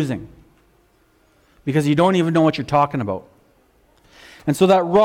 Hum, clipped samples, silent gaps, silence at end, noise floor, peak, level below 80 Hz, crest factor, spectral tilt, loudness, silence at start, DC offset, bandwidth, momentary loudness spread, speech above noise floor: none; under 0.1%; none; 0 s; -58 dBFS; -6 dBFS; -54 dBFS; 14 dB; -7 dB/octave; -19 LUFS; 0 s; under 0.1%; 16.5 kHz; 14 LU; 41 dB